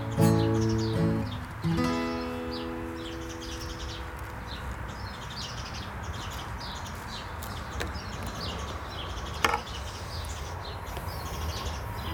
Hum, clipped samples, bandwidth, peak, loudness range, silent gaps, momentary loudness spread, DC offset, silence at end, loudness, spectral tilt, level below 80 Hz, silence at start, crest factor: none; under 0.1%; 20 kHz; -4 dBFS; 7 LU; none; 10 LU; under 0.1%; 0 s; -33 LUFS; -5.5 dB/octave; -42 dBFS; 0 s; 28 dB